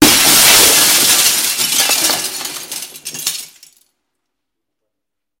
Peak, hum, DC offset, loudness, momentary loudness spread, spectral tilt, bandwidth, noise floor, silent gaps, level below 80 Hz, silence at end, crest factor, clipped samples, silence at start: 0 dBFS; none; under 0.1%; -9 LUFS; 19 LU; 0 dB/octave; over 20 kHz; -81 dBFS; none; -46 dBFS; 1.95 s; 14 dB; 0.1%; 0 s